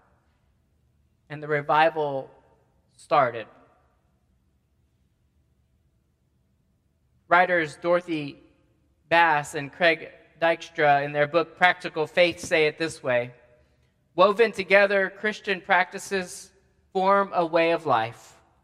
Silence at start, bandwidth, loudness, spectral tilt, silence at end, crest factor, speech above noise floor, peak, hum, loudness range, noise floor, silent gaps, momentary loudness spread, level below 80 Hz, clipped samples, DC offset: 1.3 s; 14 kHz; -23 LUFS; -4.5 dB/octave; 0.5 s; 24 dB; 45 dB; -2 dBFS; none; 7 LU; -68 dBFS; none; 14 LU; -68 dBFS; under 0.1%; under 0.1%